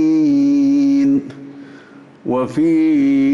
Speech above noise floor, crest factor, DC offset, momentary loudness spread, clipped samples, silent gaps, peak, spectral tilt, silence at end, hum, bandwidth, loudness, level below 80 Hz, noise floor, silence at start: 27 dB; 6 dB; under 0.1%; 18 LU; under 0.1%; none; -8 dBFS; -7.5 dB/octave; 0 s; none; 7.2 kHz; -15 LUFS; -60 dBFS; -41 dBFS; 0 s